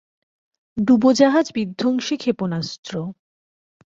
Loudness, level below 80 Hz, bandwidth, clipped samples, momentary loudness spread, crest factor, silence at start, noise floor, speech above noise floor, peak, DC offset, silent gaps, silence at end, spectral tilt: -20 LUFS; -60 dBFS; 7.8 kHz; under 0.1%; 15 LU; 18 dB; 0.75 s; under -90 dBFS; over 71 dB; -2 dBFS; under 0.1%; 2.78-2.83 s; 0.75 s; -5.5 dB/octave